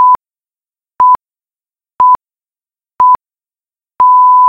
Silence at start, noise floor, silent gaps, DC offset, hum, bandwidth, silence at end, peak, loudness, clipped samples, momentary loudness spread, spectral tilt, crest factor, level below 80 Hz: 0 s; under -90 dBFS; none; under 0.1%; none; 3.3 kHz; 0 s; 0 dBFS; -9 LUFS; under 0.1%; 8 LU; -5.5 dB/octave; 10 dB; -54 dBFS